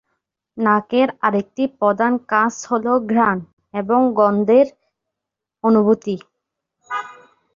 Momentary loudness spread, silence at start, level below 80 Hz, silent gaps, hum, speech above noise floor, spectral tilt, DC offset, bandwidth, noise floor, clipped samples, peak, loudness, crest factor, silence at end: 13 LU; 0.55 s; -62 dBFS; 3.53-3.57 s; none; 67 dB; -6 dB/octave; under 0.1%; 7.4 kHz; -84 dBFS; under 0.1%; -2 dBFS; -18 LUFS; 16 dB; 0.45 s